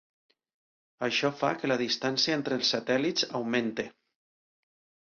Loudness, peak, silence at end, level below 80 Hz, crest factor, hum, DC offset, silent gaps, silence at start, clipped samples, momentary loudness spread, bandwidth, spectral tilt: -28 LUFS; -12 dBFS; 1.15 s; -72 dBFS; 20 dB; none; under 0.1%; none; 1 s; under 0.1%; 7 LU; 7.4 kHz; -3.5 dB/octave